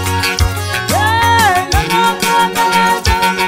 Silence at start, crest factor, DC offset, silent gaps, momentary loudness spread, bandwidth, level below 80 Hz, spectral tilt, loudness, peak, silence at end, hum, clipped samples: 0 s; 12 dB; under 0.1%; none; 5 LU; 16.5 kHz; -24 dBFS; -3.5 dB/octave; -12 LUFS; 0 dBFS; 0 s; none; under 0.1%